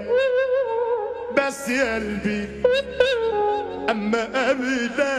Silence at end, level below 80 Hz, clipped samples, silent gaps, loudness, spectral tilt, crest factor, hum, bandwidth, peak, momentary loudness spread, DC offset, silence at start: 0 s; -48 dBFS; under 0.1%; none; -22 LUFS; -4.5 dB/octave; 16 dB; none; 14 kHz; -6 dBFS; 5 LU; under 0.1%; 0 s